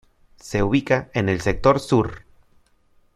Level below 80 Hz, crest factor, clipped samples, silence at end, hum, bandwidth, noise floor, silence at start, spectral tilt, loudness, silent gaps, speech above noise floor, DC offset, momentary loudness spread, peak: -40 dBFS; 20 dB; under 0.1%; 0.95 s; none; 13.5 kHz; -59 dBFS; 0.45 s; -6.5 dB/octave; -21 LUFS; none; 39 dB; under 0.1%; 7 LU; -2 dBFS